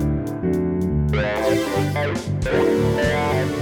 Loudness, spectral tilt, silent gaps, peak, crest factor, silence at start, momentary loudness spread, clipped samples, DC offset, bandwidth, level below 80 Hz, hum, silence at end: -21 LUFS; -6.5 dB/octave; none; -6 dBFS; 14 dB; 0 s; 5 LU; under 0.1%; under 0.1%; 19.5 kHz; -34 dBFS; none; 0 s